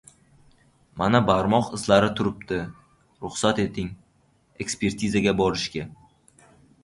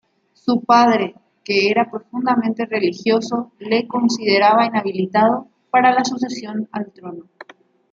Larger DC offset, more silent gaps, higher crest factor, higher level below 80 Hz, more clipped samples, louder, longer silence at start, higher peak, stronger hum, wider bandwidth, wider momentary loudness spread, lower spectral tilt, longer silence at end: neither; neither; about the same, 22 dB vs 18 dB; first, -50 dBFS vs -68 dBFS; neither; second, -24 LUFS vs -18 LUFS; first, 0.95 s vs 0.45 s; about the same, -4 dBFS vs -2 dBFS; neither; first, 11.5 kHz vs 7.6 kHz; about the same, 15 LU vs 14 LU; about the same, -5 dB/octave vs -5 dB/octave; first, 0.9 s vs 0.7 s